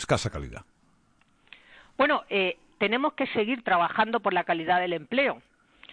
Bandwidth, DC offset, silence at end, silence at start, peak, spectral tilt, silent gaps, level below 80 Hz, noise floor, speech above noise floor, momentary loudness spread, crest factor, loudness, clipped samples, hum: 10.5 kHz; under 0.1%; 0.55 s; 0 s; -10 dBFS; -4.5 dB/octave; none; -54 dBFS; -64 dBFS; 38 dB; 13 LU; 18 dB; -26 LUFS; under 0.1%; none